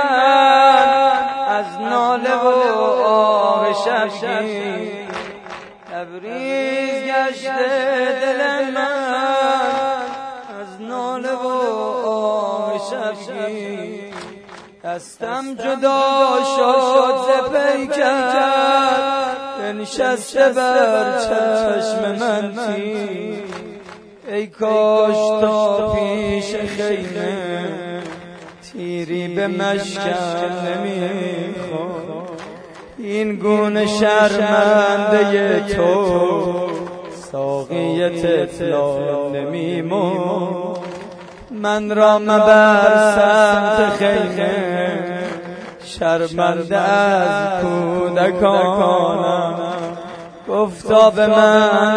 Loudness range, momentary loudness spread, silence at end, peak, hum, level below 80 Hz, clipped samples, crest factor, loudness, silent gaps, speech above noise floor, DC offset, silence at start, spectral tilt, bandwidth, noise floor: 9 LU; 17 LU; 0 s; 0 dBFS; none; -52 dBFS; under 0.1%; 16 dB; -17 LUFS; none; 23 dB; under 0.1%; 0 s; -5 dB/octave; 11 kHz; -39 dBFS